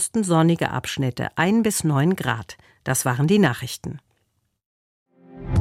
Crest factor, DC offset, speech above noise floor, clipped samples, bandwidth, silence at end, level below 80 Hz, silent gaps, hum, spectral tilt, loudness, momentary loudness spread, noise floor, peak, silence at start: 18 dB; under 0.1%; 49 dB; under 0.1%; 16 kHz; 0 s; -48 dBFS; 4.66-5.06 s; none; -5 dB/octave; -21 LUFS; 15 LU; -71 dBFS; -4 dBFS; 0 s